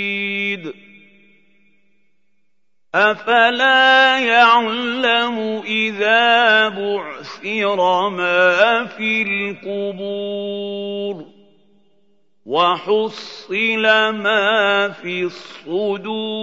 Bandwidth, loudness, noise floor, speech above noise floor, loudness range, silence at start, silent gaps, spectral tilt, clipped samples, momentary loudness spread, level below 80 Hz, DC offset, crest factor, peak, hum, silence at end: 7.8 kHz; -16 LUFS; -76 dBFS; 59 dB; 9 LU; 0 s; none; -4 dB/octave; under 0.1%; 13 LU; -72 dBFS; 0.2%; 18 dB; 0 dBFS; none; 0 s